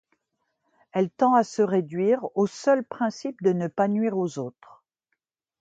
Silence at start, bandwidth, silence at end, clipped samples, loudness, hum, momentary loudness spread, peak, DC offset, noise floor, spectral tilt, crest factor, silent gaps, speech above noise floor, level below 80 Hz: 0.95 s; 8.8 kHz; 1.1 s; under 0.1%; -24 LUFS; none; 8 LU; -8 dBFS; under 0.1%; -80 dBFS; -7 dB/octave; 18 dB; none; 56 dB; -74 dBFS